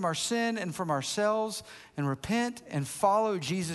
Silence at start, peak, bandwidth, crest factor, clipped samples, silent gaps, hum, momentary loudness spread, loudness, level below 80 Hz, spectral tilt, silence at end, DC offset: 0 s; -12 dBFS; 12.5 kHz; 18 dB; under 0.1%; none; none; 9 LU; -30 LUFS; -64 dBFS; -4.5 dB/octave; 0 s; under 0.1%